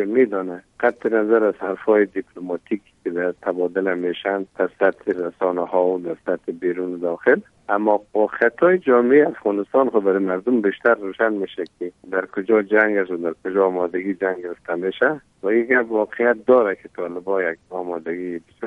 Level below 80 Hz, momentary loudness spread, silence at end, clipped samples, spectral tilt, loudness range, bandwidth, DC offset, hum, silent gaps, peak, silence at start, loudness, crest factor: -66 dBFS; 11 LU; 0 s; under 0.1%; -8 dB/octave; 5 LU; 4.6 kHz; under 0.1%; none; none; -2 dBFS; 0 s; -21 LUFS; 18 dB